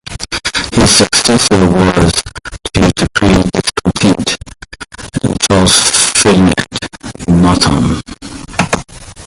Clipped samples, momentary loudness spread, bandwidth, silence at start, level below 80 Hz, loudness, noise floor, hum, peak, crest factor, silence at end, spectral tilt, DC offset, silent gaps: 0.1%; 16 LU; 16 kHz; 0.05 s; -26 dBFS; -10 LUFS; -31 dBFS; none; 0 dBFS; 12 dB; 0 s; -4 dB/octave; under 0.1%; none